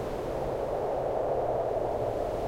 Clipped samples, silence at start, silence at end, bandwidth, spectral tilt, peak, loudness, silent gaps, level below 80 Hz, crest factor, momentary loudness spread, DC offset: under 0.1%; 0 s; 0 s; 16 kHz; -7 dB/octave; -18 dBFS; -31 LUFS; none; -46 dBFS; 12 dB; 3 LU; 0.1%